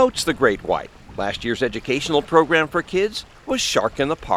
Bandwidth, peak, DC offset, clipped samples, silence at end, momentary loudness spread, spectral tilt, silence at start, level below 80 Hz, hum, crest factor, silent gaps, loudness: 15.5 kHz; 0 dBFS; under 0.1%; under 0.1%; 0 s; 9 LU; -3.5 dB/octave; 0 s; -44 dBFS; none; 20 dB; none; -21 LUFS